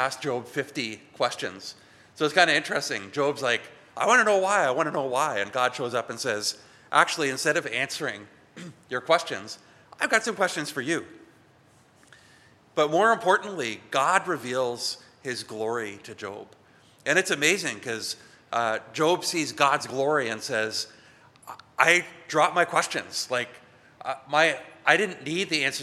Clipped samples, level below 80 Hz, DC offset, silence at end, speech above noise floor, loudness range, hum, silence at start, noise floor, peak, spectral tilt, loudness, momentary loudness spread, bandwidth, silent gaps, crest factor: under 0.1%; -76 dBFS; under 0.1%; 0 s; 32 dB; 4 LU; none; 0 s; -58 dBFS; -2 dBFS; -2.5 dB/octave; -25 LUFS; 15 LU; 15 kHz; none; 24 dB